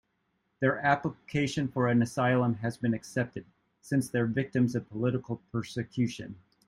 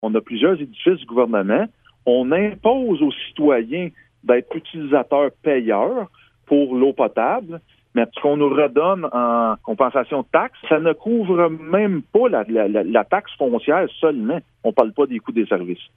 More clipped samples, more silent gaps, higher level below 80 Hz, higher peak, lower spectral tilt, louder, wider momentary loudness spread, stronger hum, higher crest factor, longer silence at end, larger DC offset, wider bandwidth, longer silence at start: neither; neither; about the same, -64 dBFS vs -62 dBFS; second, -10 dBFS vs 0 dBFS; second, -6.5 dB/octave vs -9.5 dB/octave; second, -30 LUFS vs -19 LUFS; first, 9 LU vs 6 LU; neither; about the same, 20 dB vs 18 dB; first, 0.3 s vs 0.15 s; neither; first, 13 kHz vs 3.8 kHz; first, 0.6 s vs 0 s